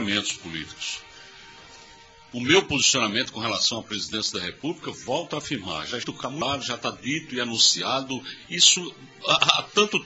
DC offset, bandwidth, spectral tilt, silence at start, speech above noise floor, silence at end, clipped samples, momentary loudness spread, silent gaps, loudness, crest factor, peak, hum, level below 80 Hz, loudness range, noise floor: under 0.1%; 8 kHz; -1 dB/octave; 0 s; 25 dB; 0 s; under 0.1%; 14 LU; none; -23 LUFS; 26 dB; 0 dBFS; none; -58 dBFS; 8 LU; -50 dBFS